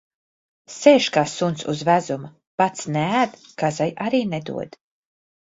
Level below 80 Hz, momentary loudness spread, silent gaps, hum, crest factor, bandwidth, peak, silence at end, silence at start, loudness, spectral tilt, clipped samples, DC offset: -64 dBFS; 15 LU; 2.47-2.58 s; none; 22 dB; 8 kHz; 0 dBFS; 0.9 s; 0.7 s; -21 LUFS; -5 dB/octave; under 0.1%; under 0.1%